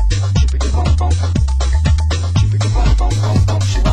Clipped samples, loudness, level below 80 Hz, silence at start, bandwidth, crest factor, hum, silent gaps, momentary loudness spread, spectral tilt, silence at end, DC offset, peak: under 0.1%; -15 LUFS; -16 dBFS; 0 s; 10 kHz; 10 dB; none; none; 2 LU; -6 dB/octave; 0 s; under 0.1%; -2 dBFS